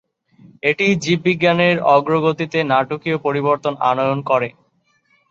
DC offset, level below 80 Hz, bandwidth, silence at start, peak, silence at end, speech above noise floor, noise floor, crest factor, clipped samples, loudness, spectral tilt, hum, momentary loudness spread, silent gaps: under 0.1%; -60 dBFS; 7.8 kHz; 0.65 s; -2 dBFS; 0.8 s; 45 dB; -62 dBFS; 16 dB; under 0.1%; -17 LUFS; -6 dB/octave; none; 6 LU; none